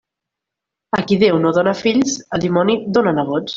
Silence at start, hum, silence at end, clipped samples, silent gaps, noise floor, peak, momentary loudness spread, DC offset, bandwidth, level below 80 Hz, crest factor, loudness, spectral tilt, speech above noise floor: 0.95 s; none; 0 s; under 0.1%; none; -83 dBFS; -2 dBFS; 6 LU; under 0.1%; 7.8 kHz; -54 dBFS; 14 dB; -16 LUFS; -5.5 dB/octave; 67 dB